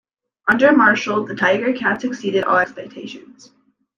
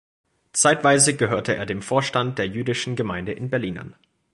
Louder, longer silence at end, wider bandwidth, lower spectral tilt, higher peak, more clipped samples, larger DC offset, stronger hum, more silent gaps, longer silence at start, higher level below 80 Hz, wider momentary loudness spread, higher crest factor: first, -17 LUFS vs -21 LUFS; first, 0.8 s vs 0.4 s; second, 7.4 kHz vs 11.5 kHz; first, -5 dB/octave vs -3.5 dB/octave; about the same, -2 dBFS vs -4 dBFS; neither; neither; neither; neither; about the same, 0.45 s vs 0.55 s; second, -60 dBFS vs -54 dBFS; first, 20 LU vs 11 LU; about the same, 16 dB vs 20 dB